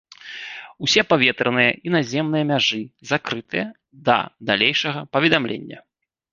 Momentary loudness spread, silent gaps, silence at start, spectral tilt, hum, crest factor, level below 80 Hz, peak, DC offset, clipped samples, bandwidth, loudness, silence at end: 15 LU; none; 0.25 s; -4 dB/octave; none; 22 dB; -60 dBFS; 0 dBFS; under 0.1%; under 0.1%; 7.6 kHz; -20 LUFS; 0.5 s